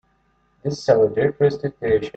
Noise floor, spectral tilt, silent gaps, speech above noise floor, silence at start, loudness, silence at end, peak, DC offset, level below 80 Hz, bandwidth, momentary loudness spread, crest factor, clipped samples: -63 dBFS; -7 dB/octave; none; 44 dB; 0.65 s; -20 LUFS; 0.05 s; -2 dBFS; under 0.1%; -52 dBFS; 8 kHz; 11 LU; 18 dB; under 0.1%